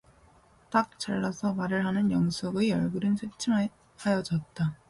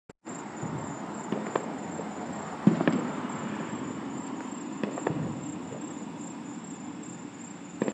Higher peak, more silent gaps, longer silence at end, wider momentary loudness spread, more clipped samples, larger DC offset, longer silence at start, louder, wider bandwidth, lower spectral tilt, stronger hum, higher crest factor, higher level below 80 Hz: second, -12 dBFS vs -6 dBFS; neither; first, 0.15 s vs 0 s; second, 5 LU vs 13 LU; neither; neither; first, 0.7 s vs 0.1 s; first, -29 LUFS vs -34 LUFS; first, 11.5 kHz vs 10 kHz; about the same, -6 dB/octave vs -6 dB/octave; neither; second, 16 dB vs 26 dB; first, -60 dBFS vs -70 dBFS